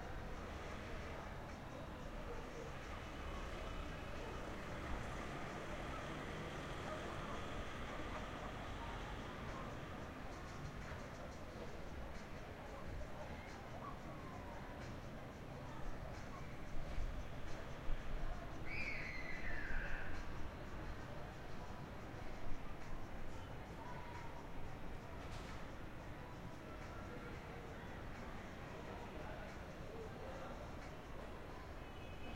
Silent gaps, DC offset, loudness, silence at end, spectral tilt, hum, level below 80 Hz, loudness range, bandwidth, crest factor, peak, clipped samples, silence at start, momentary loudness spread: none; under 0.1%; -50 LUFS; 0 s; -5.5 dB/octave; none; -52 dBFS; 4 LU; 16 kHz; 20 dB; -28 dBFS; under 0.1%; 0 s; 5 LU